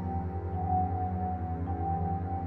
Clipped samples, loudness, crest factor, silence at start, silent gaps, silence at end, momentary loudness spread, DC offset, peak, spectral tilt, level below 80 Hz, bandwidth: under 0.1%; -33 LUFS; 14 dB; 0 s; none; 0 s; 5 LU; under 0.1%; -18 dBFS; -12 dB/octave; -42 dBFS; 2.8 kHz